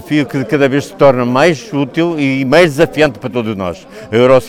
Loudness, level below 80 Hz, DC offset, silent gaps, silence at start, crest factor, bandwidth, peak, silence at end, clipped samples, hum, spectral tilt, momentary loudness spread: -12 LUFS; -44 dBFS; under 0.1%; none; 0 s; 12 dB; 16 kHz; 0 dBFS; 0 s; 0.2%; none; -6 dB/octave; 10 LU